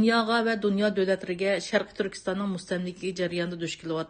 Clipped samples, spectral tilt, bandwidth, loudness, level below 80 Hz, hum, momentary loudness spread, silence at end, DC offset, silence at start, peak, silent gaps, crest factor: under 0.1%; -5 dB/octave; 9.6 kHz; -28 LUFS; -62 dBFS; none; 7 LU; 0 s; under 0.1%; 0 s; -8 dBFS; none; 18 dB